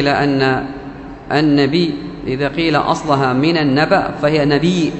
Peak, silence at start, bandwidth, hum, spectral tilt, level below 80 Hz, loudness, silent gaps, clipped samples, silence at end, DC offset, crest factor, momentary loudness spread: 0 dBFS; 0 s; 8.4 kHz; none; -6.5 dB/octave; -42 dBFS; -15 LUFS; none; under 0.1%; 0 s; under 0.1%; 16 dB; 11 LU